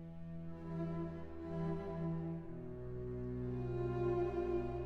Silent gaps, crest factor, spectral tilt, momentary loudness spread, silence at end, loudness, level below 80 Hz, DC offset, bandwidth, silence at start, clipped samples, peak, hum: none; 14 dB; -10 dB/octave; 11 LU; 0 s; -42 LUFS; -54 dBFS; under 0.1%; 6.2 kHz; 0 s; under 0.1%; -28 dBFS; none